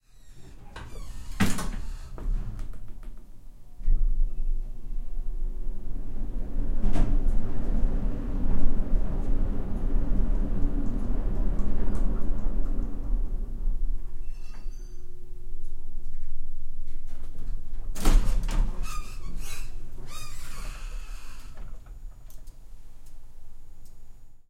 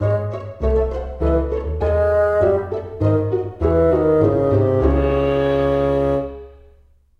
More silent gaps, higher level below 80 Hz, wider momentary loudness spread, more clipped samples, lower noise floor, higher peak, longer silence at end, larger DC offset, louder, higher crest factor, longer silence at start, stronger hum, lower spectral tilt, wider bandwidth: neither; about the same, -26 dBFS vs -28 dBFS; first, 20 LU vs 8 LU; neither; second, -44 dBFS vs -52 dBFS; about the same, -6 dBFS vs -4 dBFS; second, 0.1 s vs 0.7 s; neither; second, -34 LUFS vs -18 LUFS; about the same, 16 dB vs 14 dB; first, 0.25 s vs 0 s; neither; second, -6 dB/octave vs -9.5 dB/octave; first, 10.5 kHz vs 6.4 kHz